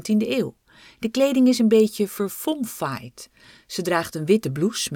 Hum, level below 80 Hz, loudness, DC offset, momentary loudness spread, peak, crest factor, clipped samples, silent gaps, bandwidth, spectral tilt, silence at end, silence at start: none; -62 dBFS; -22 LUFS; under 0.1%; 14 LU; -6 dBFS; 16 dB; under 0.1%; none; 18.5 kHz; -5 dB/octave; 0 s; 0 s